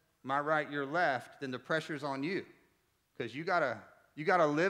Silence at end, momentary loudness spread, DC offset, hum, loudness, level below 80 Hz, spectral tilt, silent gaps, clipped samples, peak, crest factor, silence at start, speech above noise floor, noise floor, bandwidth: 0 s; 11 LU; under 0.1%; none; -34 LUFS; -84 dBFS; -5.5 dB/octave; none; under 0.1%; -16 dBFS; 20 dB; 0.25 s; 41 dB; -75 dBFS; 14 kHz